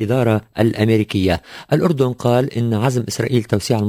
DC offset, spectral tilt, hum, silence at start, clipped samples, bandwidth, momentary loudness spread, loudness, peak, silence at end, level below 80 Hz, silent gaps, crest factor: under 0.1%; -6.5 dB/octave; none; 0 s; under 0.1%; 16 kHz; 4 LU; -18 LUFS; -2 dBFS; 0 s; -40 dBFS; none; 16 dB